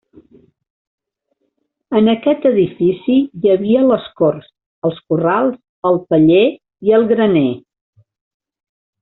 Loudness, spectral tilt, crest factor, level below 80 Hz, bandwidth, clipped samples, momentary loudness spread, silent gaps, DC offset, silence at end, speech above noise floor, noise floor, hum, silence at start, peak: -15 LUFS; -6 dB/octave; 14 dB; -56 dBFS; 4.1 kHz; under 0.1%; 9 LU; 4.66-4.82 s, 5.69-5.82 s; under 0.1%; 1.4 s; 55 dB; -69 dBFS; none; 1.9 s; -2 dBFS